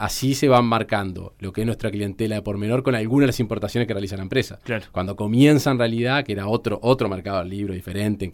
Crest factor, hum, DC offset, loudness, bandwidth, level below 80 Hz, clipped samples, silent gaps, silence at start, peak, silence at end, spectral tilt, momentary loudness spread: 16 dB; none; under 0.1%; -22 LUFS; 17.5 kHz; -46 dBFS; under 0.1%; none; 0 s; -4 dBFS; 0 s; -6 dB/octave; 11 LU